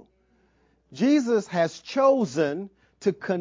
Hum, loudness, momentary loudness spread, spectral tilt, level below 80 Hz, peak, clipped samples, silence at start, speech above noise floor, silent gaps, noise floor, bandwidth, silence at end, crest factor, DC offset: none; -24 LUFS; 8 LU; -6 dB/octave; -70 dBFS; -10 dBFS; under 0.1%; 0.9 s; 42 dB; none; -65 dBFS; 7.6 kHz; 0 s; 16 dB; under 0.1%